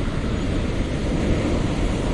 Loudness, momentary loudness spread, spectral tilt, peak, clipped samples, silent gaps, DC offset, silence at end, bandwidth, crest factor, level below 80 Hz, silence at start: -24 LUFS; 3 LU; -6.5 dB/octave; -8 dBFS; under 0.1%; none; under 0.1%; 0 s; 11 kHz; 14 dB; -26 dBFS; 0 s